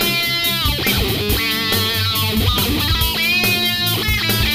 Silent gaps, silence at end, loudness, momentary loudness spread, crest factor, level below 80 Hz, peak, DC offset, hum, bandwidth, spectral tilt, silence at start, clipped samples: none; 0 s; -16 LUFS; 2 LU; 14 dB; -28 dBFS; -4 dBFS; 0.4%; none; 15.5 kHz; -3 dB/octave; 0 s; under 0.1%